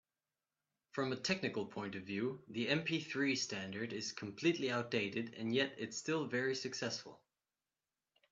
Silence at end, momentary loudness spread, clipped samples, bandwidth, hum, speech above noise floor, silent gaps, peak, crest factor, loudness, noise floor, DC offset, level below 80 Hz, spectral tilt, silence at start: 1.15 s; 7 LU; under 0.1%; 8.4 kHz; none; over 51 dB; none; -20 dBFS; 20 dB; -39 LUFS; under -90 dBFS; under 0.1%; -82 dBFS; -4 dB/octave; 0.95 s